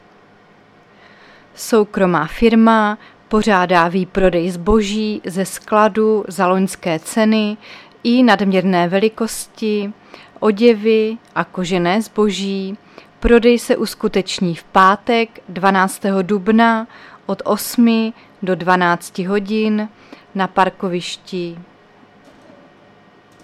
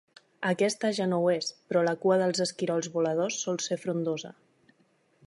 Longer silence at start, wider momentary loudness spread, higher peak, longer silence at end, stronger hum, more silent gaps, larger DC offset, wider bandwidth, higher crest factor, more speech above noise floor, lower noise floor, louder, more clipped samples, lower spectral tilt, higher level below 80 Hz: first, 1.55 s vs 0.4 s; first, 11 LU vs 6 LU; first, 0 dBFS vs -12 dBFS; first, 1.8 s vs 0.95 s; neither; neither; neither; first, 14.5 kHz vs 11.5 kHz; about the same, 16 dB vs 16 dB; second, 32 dB vs 40 dB; second, -48 dBFS vs -68 dBFS; first, -16 LUFS vs -28 LUFS; neither; about the same, -5.5 dB/octave vs -4.5 dB/octave; first, -38 dBFS vs -80 dBFS